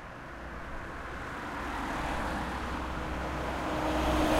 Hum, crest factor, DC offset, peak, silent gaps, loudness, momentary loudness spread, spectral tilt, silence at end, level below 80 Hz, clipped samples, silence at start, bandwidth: none; 20 dB; under 0.1%; -14 dBFS; none; -35 LUFS; 11 LU; -5.5 dB/octave; 0 s; -40 dBFS; under 0.1%; 0 s; 16 kHz